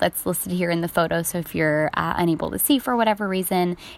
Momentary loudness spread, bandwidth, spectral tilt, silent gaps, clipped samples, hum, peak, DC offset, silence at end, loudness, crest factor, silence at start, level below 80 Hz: 4 LU; 16.5 kHz; -4.5 dB/octave; none; under 0.1%; none; -4 dBFS; under 0.1%; 0 s; -22 LUFS; 18 dB; 0 s; -50 dBFS